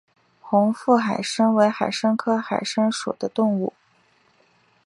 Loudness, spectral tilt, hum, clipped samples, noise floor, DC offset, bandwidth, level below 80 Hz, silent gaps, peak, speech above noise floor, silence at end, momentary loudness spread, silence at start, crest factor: -22 LUFS; -5 dB/octave; none; under 0.1%; -61 dBFS; under 0.1%; 11.5 kHz; -70 dBFS; none; -4 dBFS; 40 dB; 1.15 s; 7 LU; 0.45 s; 20 dB